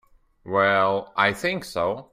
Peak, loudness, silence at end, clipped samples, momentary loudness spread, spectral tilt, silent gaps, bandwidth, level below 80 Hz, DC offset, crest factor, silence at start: -4 dBFS; -23 LUFS; 0.1 s; under 0.1%; 7 LU; -4.5 dB/octave; none; 16 kHz; -58 dBFS; under 0.1%; 18 dB; 0.45 s